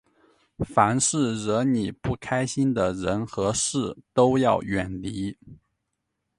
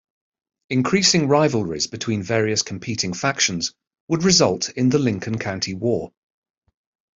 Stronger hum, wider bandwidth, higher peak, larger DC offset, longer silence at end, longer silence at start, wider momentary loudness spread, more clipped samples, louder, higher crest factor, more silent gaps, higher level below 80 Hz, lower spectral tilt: neither; first, 11.5 kHz vs 7.8 kHz; about the same, -4 dBFS vs -4 dBFS; neither; second, 0.85 s vs 1.1 s; about the same, 0.6 s vs 0.7 s; about the same, 11 LU vs 10 LU; neither; second, -24 LUFS vs -20 LUFS; about the same, 22 dB vs 18 dB; second, none vs 4.00-4.07 s; first, -50 dBFS vs -56 dBFS; about the same, -5 dB/octave vs -4 dB/octave